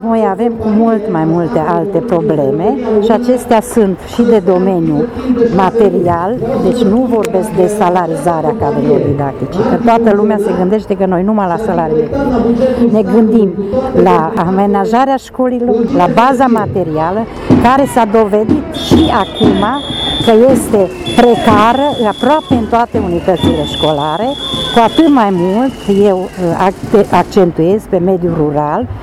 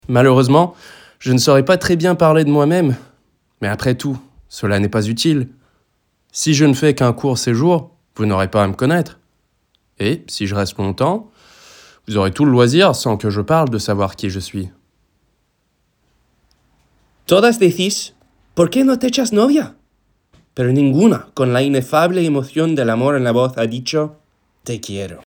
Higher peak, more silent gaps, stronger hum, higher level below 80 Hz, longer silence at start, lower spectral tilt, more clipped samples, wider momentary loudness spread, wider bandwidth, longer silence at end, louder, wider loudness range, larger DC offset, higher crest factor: about the same, 0 dBFS vs 0 dBFS; neither; neither; first, -34 dBFS vs -50 dBFS; about the same, 0 s vs 0.1 s; about the same, -6.5 dB/octave vs -5.5 dB/octave; first, 0.3% vs under 0.1%; second, 5 LU vs 14 LU; second, 14.5 kHz vs 20 kHz; about the same, 0 s vs 0.1 s; first, -11 LUFS vs -16 LUFS; second, 2 LU vs 6 LU; neither; second, 10 dB vs 16 dB